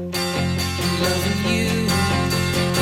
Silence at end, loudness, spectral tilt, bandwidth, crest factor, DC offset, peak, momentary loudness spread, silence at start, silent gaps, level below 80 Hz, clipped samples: 0 s; -20 LUFS; -4.5 dB/octave; 17 kHz; 14 dB; under 0.1%; -8 dBFS; 3 LU; 0 s; none; -42 dBFS; under 0.1%